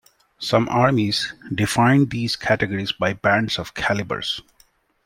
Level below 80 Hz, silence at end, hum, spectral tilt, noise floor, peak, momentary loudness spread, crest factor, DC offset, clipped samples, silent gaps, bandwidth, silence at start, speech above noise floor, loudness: -50 dBFS; 0.65 s; none; -5 dB/octave; -59 dBFS; -2 dBFS; 8 LU; 20 dB; under 0.1%; under 0.1%; none; 16.5 kHz; 0.4 s; 39 dB; -21 LUFS